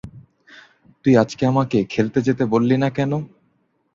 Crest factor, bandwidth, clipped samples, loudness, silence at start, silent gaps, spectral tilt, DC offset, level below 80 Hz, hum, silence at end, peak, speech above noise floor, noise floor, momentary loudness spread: 18 dB; 7.6 kHz; under 0.1%; -19 LUFS; 0.05 s; none; -7.5 dB/octave; under 0.1%; -54 dBFS; none; 0.7 s; -2 dBFS; 47 dB; -65 dBFS; 7 LU